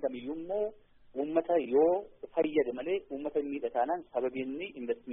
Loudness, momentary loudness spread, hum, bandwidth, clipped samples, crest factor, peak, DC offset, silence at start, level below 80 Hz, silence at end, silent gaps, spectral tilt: -32 LUFS; 11 LU; none; 3.8 kHz; under 0.1%; 18 dB; -14 dBFS; under 0.1%; 0 s; -66 dBFS; 0 s; none; -1.5 dB/octave